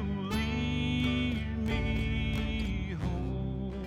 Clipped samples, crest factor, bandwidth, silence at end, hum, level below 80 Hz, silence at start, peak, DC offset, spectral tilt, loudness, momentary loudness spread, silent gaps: under 0.1%; 14 dB; 15 kHz; 0 s; none; -38 dBFS; 0 s; -18 dBFS; under 0.1%; -6.5 dB/octave; -32 LUFS; 5 LU; none